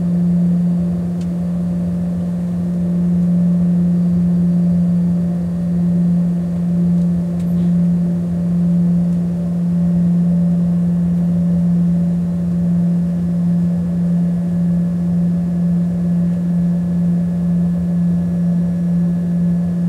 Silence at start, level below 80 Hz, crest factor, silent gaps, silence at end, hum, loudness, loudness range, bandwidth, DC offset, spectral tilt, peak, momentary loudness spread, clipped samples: 0 s; -40 dBFS; 8 dB; none; 0 s; none; -16 LUFS; 1 LU; 2 kHz; under 0.1%; -10.5 dB/octave; -8 dBFS; 4 LU; under 0.1%